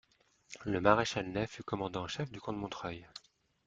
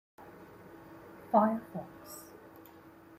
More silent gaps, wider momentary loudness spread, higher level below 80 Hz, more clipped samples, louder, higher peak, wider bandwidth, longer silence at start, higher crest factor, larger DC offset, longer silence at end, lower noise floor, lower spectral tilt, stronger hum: neither; second, 20 LU vs 26 LU; first, -62 dBFS vs -74 dBFS; neither; second, -35 LUFS vs -31 LUFS; first, -10 dBFS vs -14 dBFS; second, 9.2 kHz vs 16 kHz; first, 0.5 s vs 0.2 s; about the same, 26 dB vs 24 dB; neither; second, 0.5 s vs 0.95 s; first, -63 dBFS vs -55 dBFS; second, -5 dB/octave vs -7 dB/octave; neither